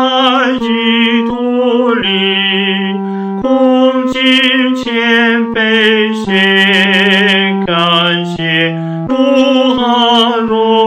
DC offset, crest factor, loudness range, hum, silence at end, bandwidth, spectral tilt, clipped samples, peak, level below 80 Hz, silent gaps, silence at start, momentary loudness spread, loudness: under 0.1%; 10 dB; 2 LU; none; 0 s; 10.5 kHz; -5.5 dB/octave; under 0.1%; 0 dBFS; -48 dBFS; none; 0 s; 6 LU; -10 LUFS